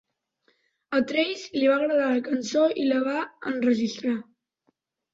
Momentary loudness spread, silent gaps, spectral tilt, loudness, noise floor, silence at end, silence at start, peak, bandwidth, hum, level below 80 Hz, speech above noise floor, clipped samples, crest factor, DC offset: 7 LU; none; -4.5 dB/octave; -25 LUFS; -73 dBFS; 0.9 s; 0.9 s; -10 dBFS; 7.8 kHz; none; -72 dBFS; 48 dB; under 0.1%; 16 dB; under 0.1%